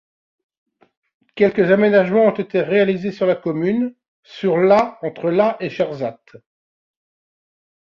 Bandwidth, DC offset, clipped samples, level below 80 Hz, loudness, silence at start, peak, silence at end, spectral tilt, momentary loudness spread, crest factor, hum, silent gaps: 7 kHz; under 0.1%; under 0.1%; -62 dBFS; -18 LUFS; 1.35 s; -2 dBFS; 1.8 s; -8 dB/octave; 10 LU; 16 dB; none; 4.08-4.23 s